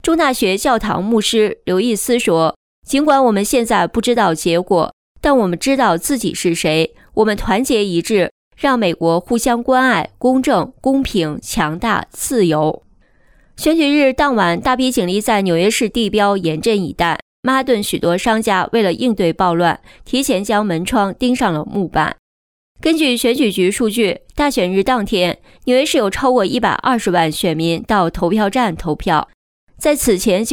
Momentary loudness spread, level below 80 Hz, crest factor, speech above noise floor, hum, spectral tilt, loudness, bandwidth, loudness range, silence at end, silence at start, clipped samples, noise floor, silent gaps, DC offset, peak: 5 LU; -38 dBFS; 12 dB; 36 dB; none; -4.5 dB/octave; -16 LUFS; 19.5 kHz; 2 LU; 0 s; 0.05 s; under 0.1%; -51 dBFS; 2.56-2.82 s, 4.93-5.15 s, 8.31-8.51 s, 17.22-17.43 s, 22.19-22.75 s, 29.34-29.67 s; under 0.1%; -2 dBFS